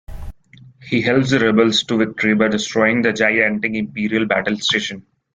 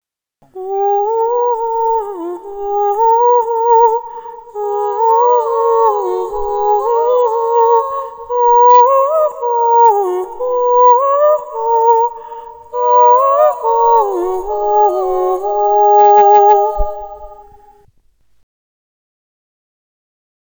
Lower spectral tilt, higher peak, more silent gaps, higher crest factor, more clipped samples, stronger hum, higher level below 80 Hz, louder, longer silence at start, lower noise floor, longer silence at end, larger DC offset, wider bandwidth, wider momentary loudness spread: about the same, -4.5 dB/octave vs -5.5 dB/octave; about the same, -2 dBFS vs 0 dBFS; neither; about the same, 16 dB vs 12 dB; second, under 0.1% vs 0.2%; neither; second, -44 dBFS vs -36 dBFS; second, -17 LUFS vs -12 LUFS; second, 0.1 s vs 0.55 s; second, -46 dBFS vs -52 dBFS; second, 0.35 s vs 3 s; neither; second, 9.2 kHz vs over 20 kHz; second, 7 LU vs 14 LU